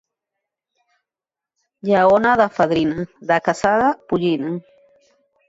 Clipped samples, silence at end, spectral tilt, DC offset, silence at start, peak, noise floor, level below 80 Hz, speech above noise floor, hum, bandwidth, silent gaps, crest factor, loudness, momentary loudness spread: under 0.1%; 0.9 s; -6 dB/octave; under 0.1%; 1.85 s; -4 dBFS; -89 dBFS; -54 dBFS; 72 dB; none; 8 kHz; none; 18 dB; -18 LUFS; 13 LU